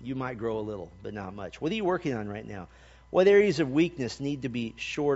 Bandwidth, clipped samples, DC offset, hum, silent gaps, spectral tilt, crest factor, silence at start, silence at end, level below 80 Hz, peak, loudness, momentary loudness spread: 8 kHz; under 0.1%; under 0.1%; none; none; -5 dB/octave; 18 dB; 0 s; 0 s; -56 dBFS; -10 dBFS; -28 LUFS; 18 LU